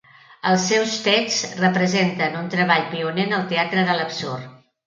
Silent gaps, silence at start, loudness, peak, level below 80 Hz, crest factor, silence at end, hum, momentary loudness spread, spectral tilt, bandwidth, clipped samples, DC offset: none; 0.3 s; -20 LUFS; -2 dBFS; -66 dBFS; 18 dB; 0.3 s; none; 8 LU; -4 dB/octave; 7.6 kHz; under 0.1%; under 0.1%